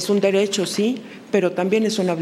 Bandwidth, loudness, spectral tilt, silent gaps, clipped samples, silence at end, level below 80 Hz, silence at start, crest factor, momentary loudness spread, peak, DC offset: 15.5 kHz; -20 LUFS; -4.5 dB/octave; none; under 0.1%; 0 s; -70 dBFS; 0 s; 14 dB; 5 LU; -6 dBFS; under 0.1%